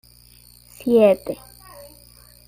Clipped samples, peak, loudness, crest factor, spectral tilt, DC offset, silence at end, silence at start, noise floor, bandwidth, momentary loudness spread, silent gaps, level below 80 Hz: under 0.1%; -4 dBFS; -18 LUFS; 18 dB; -6 dB/octave; under 0.1%; 1.15 s; 0.8 s; -50 dBFS; 16 kHz; 27 LU; none; -54 dBFS